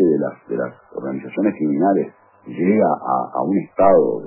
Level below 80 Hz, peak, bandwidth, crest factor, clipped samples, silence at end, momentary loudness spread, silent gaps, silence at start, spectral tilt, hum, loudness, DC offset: -56 dBFS; -2 dBFS; 3.1 kHz; 16 dB; under 0.1%; 0 s; 14 LU; none; 0 s; -13 dB/octave; none; -19 LUFS; under 0.1%